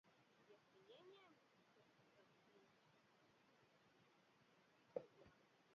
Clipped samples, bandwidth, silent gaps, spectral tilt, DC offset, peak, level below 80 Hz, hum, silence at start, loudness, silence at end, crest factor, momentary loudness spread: under 0.1%; 6.8 kHz; none; -3.5 dB/octave; under 0.1%; -34 dBFS; under -90 dBFS; none; 0.05 s; -60 LUFS; 0 s; 32 dB; 13 LU